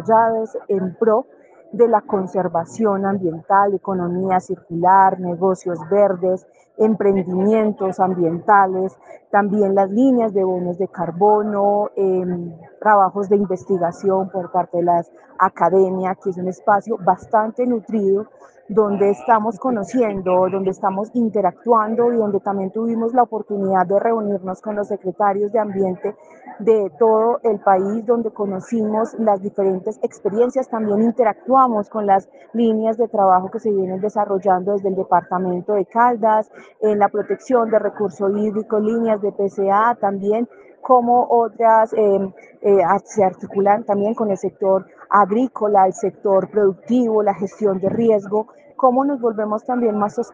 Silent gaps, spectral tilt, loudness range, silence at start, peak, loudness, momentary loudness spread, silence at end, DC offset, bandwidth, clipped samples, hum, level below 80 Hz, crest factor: none; -8 dB/octave; 2 LU; 0 s; 0 dBFS; -18 LUFS; 7 LU; 0.05 s; under 0.1%; 7.8 kHz; under 0.1%; none; -64 dBFS; 18 dB